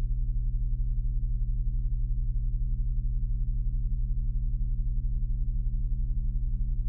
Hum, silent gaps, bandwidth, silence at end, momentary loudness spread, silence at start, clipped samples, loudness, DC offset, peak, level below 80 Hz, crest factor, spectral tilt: none; none; 0.5 kHz; 0 s; 1 LU; 0 s; under 0.1%; -33 LUFS; under 0.1%; -18 dBFS; -28 dBFS; 8 dB; -19.5 dB/octave